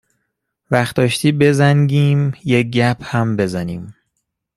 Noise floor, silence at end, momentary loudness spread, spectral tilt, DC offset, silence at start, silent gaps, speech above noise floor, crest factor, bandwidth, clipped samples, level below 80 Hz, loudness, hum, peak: -73 dBFS; 0.65 s; 7 LU; -6.5 dB/octave; under 0.1%; 0.7 s; none; 58 dB; 16 dB; 13 kHz; under 0.1%; -52 dBFS; -16 LUFS; none; -2 dBFS